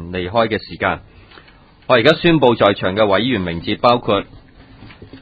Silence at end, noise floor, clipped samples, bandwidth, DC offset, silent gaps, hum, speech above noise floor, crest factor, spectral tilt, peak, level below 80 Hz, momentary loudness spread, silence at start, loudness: 0.05 s; -46 dBFS; under 0.1%; 8 kHz; under 0.1%; none; none; 31 dB; 18 dB; -7.5 dB/octave; 0 dBFS; -42 dBFS; 9 LU; 0 s; -16 LUFS